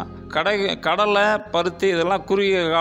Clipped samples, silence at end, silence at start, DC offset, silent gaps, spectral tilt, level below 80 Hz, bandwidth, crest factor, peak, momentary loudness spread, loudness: under 0.1%; 0 s; 0 s; under 0.1%; none; -4.5 dB/octave; -52 dBFS; 11 kHz; 14 dB; -6 dBFS; 5 LU; -20 LUFS